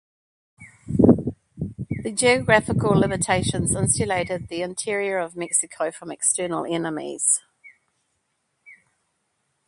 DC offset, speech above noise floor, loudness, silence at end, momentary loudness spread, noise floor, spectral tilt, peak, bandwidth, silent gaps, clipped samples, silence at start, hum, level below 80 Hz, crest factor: under 0.1%; 51 dB; -22 LUFS; 0.95 s; 11 LU; -73 dBFS; -4 dB/octave; 0 dBFS; 11.5 kHz; none; under 0.1%; 0.6 s; none; -46 dBFS; 24 dB